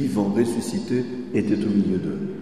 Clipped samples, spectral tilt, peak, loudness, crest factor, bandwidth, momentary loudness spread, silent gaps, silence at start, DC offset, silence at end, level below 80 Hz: under 0.1%; -7 dB/octave; -8 dBFS; -23 LUFS; 16 dB; 13 kHz; 5 LU; none; 0 s; 0.5%; 0 s; -54 dBFS